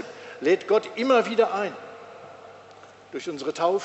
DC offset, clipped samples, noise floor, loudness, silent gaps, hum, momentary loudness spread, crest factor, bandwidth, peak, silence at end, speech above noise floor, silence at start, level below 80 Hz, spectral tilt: under 0.1%; under 0.1%; -48 dBFS; -24 LUFS; none; 50 Hz at -65 dBFS; 23 LU; 18 dB; 8.2 kHz; -8 dBFS; 0 s; 25 dB; 0 s; -78 dBFS; -4.5 dB/octave